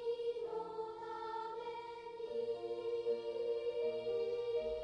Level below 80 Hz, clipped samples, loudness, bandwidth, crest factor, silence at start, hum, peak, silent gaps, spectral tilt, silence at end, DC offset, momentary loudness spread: -70 dBFS; under 0.1%; -41 LUFS; 9.4 kHz; 14 dB; 0 s; none; -28 dBFS; none; -5.5 dB/octave; 0 s; under 0.1%; 7 LU